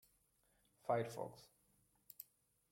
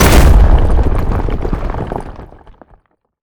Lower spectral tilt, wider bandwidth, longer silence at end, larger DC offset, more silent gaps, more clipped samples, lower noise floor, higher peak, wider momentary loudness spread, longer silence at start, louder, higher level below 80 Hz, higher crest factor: about the same, -6 dB/octave vs -5.5 dB/octave; second, 16.5 kHz vs over 20 kHz; second, 0.5 s vs 0.95 s; neither; neither; neither; first, -79 dBFS vs -50 dBFS; second, -26 dBFS vs 0 dBFS; first, 20 LU vs 17 LU; first, 0.85 s vs 0 s; second, -44 LUFS vs -14 LUFS; second, -84 dBFS vs -12 dBFS; first, 22 dB vs 10 dB